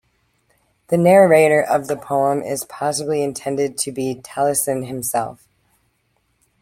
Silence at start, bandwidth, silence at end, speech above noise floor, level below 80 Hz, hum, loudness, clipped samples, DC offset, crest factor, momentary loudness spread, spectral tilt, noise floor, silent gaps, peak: 0.9 s; 16.5 kHz; 1.25 s; 48 dB; -60 dBFS; none; -18 LUFS; under 0.1%; under 0.1%; 18 dB; 12 LU; -4.5 dB/octave; -66 dBFS; none; -2 dBFS